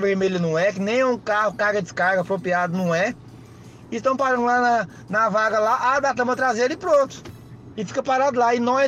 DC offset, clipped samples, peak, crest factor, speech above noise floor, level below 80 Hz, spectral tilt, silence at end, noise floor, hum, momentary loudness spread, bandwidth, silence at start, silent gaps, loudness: under 0.1%; under 0.1%; -10 dBFS; 12 dB; 22 dB; -58 dBFS; -5 dB/octave; 0 s; -43 dBFS; none; 8 LU; 13 kHz; 0 s; none; -21 LUFS